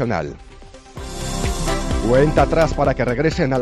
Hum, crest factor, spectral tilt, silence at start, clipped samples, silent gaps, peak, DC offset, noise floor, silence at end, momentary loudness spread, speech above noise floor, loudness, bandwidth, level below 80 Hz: none; 14 dB; -6 dB/octave; 0 s; under 0.1%; none; -4 dBFS; under 0.1%; -39 dBFS; 0 s; 17 LU; 22 dB; -19 LUFS; 13.5 kHz; -28 dBFS